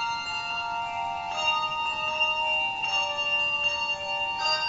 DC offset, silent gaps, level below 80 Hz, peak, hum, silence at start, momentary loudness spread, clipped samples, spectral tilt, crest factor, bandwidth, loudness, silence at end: under 0.1%; none; -60 dBFS; -14 dBFS; none; 0 s; 6 LU; under 0.1%; -0.5 dB/octave; 14 dB; 8 kHz; -26 LUFS; 0 s